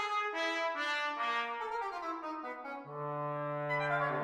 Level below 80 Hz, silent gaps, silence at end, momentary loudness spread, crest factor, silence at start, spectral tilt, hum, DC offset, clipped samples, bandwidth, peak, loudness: -78 dBFS; none; 0 s; 9 LU; 14 dB; 0 s; -4.5 dB/octave; none; under 0.1%; under 0.1%; 15.5 kHz; -22 dBFS; -36 LUFS